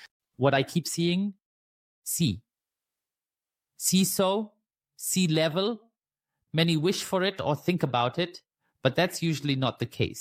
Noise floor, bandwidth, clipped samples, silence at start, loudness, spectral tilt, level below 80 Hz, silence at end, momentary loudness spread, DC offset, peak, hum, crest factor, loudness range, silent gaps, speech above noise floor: under -90 dBFS; 16 kHz; under 0.1%; 0 s; -27 LUFS; -4.5 dB/octave; -64 dBFS; 0 s; 8 LU; under 0.1%; -8 dBFS; none; 20 dB; 3 LU; 0.11-0.20 s, 1.46-2.02 s; over 64 dB